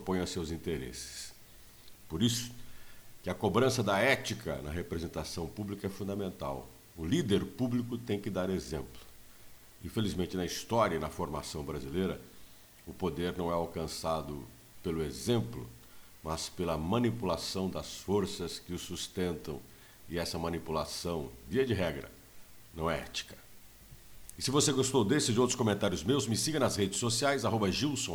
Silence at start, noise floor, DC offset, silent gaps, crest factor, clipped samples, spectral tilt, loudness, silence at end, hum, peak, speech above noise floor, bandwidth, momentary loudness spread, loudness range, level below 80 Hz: 0 s; -54 dBFS; under 0.1%; none; 20 dB; under 0.1%; -4.5 dB/octave; -33 LUFS; 0 s; none; -14 dBFS; 21 dB; over 20 kHz; 16 LU; 7 LU; -54 dBFS